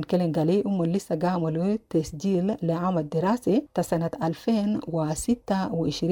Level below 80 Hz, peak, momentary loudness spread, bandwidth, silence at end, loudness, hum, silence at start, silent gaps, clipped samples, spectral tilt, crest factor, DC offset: -52 dBFS; -12 dBFS; 4 LU; 18 kHz; 0 s; -26 LUFS; none; 0 s; none; under 0.1%; -7 dB/octave; 14 dB; under 0.1%